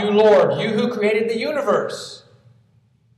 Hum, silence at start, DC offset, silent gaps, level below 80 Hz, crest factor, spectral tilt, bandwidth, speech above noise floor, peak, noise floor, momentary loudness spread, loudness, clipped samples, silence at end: none; 0 s; under 0.1%; none; -68 dBFS; 16 dB; -5.5 dB/octave; 12.5 kHz; 40 dB; -4 dBFS; -58 dBFS; 15 LU; -18 LUFS; under 0.1%; 1 s